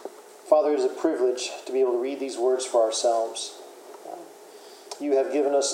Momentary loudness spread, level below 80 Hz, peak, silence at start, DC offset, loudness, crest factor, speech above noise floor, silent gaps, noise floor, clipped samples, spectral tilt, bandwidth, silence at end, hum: 22 LU; under -90 dBFS; -6 dBFS; 0 s; under 0.1%; -25 LUFS; 20 dB; 23 dB; none; -46 dBFS; under 0.1%; -1.5 dB/octave; 15.5 kHz; 0 s; none